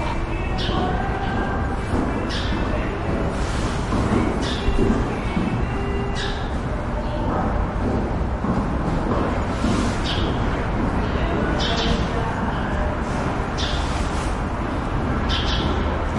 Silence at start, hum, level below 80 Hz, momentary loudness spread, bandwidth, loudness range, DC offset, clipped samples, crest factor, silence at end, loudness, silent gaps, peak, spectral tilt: 0 s; none; -26 dBFS; 4 LU; 11.5 kHz; 2 LU; under 0.1%; under 0.1%; 16 dB; 0 s; -23 LUFS; none; -6 dBFS; -6 dB/octave